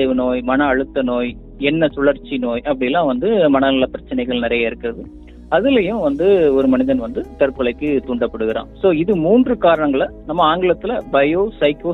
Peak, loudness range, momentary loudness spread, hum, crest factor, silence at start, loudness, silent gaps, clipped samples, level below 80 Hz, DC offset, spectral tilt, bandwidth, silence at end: -2 dBFS; 2 LU; 8 LU; none; 14 dB; 0 s; -17 LUFS; none; under 0.1%; -40 dBFS; under 0.1%; -8.5 dB/octave; 4.1 kHz; 0 s